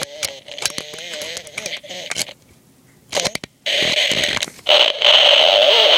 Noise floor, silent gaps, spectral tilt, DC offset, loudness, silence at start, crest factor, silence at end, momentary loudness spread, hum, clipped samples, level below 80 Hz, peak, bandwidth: -51 dBFS; none; 0 dB/octave; under 0.1%; -14 LUFS; 0 s; 18 dB; 0 s; 18 LU; none; under 0.1%; -56 dBFS; 0 dBFS; 17 kHz